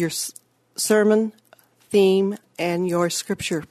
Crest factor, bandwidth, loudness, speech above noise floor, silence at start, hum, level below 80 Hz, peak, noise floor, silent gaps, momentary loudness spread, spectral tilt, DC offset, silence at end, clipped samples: 16 dB; 14 kHz; -21 LUFS; 35 dB; 0 s; none; -62 dBFS; -6 dBFS; -56 dBFS; none; 11 LU; -4.5 dB/octave; under 0.1%; 0.05 s; under 0.1%